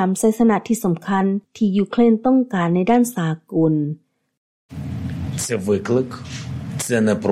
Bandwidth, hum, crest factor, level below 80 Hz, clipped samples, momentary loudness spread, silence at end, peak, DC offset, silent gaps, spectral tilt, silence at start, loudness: 15 kHz; none; 14 dB; -50 dBFS; under 0.1%; 13 LU; 0 s; -4 dBFS; under 0.1%; 4.37-4.69 s; -6 dB/octave; 0 s; -19 LUFS